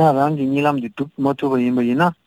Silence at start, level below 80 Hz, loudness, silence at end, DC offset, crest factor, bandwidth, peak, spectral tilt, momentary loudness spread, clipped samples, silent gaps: 0 s; -60 dBFS; -19 LUFS; 0.15 s; under 0.1%; 14 dB; 15.5 kHz; -4 dBFS; -8 dB/octave; 6 LU; under 0.1%; none